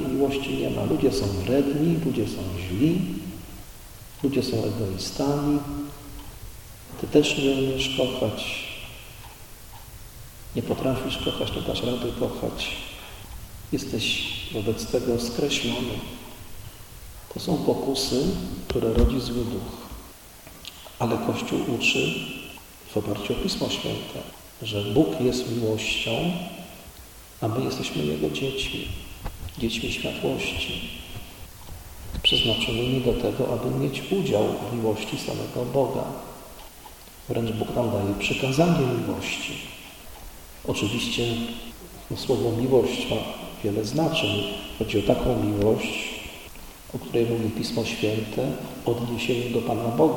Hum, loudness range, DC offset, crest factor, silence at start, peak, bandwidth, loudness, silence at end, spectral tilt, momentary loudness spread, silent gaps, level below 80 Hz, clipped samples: none; 4 LU; under 0.1%; 22 dB; 0 s; -4 dBFS; 17.5 kHz; -26 LUFS; 0 s; -5 dB/octave; 20 LU; none; -42 dBFS; under 0.1%